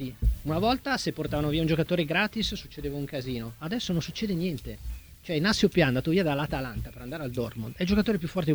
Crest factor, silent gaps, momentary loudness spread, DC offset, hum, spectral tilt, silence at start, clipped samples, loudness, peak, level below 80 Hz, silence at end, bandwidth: 18 dB; none; 12 LU; under 0.1%; none; -6 dB/octave; 0 s; under 0.1%; -28 LUFS; -10 dBFS; -40 dBFS; 0 s; over 20 kHz